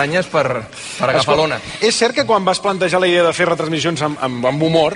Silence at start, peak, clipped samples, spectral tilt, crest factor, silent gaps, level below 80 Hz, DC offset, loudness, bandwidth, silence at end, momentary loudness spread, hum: 0 s; -2 dBFS; under 0.1%; -4 dB/octave; 14 dB; none; -50 dBFS; under 0.1%; -16 LUFS; 11.5 kHz; 0 s; 6 LU; none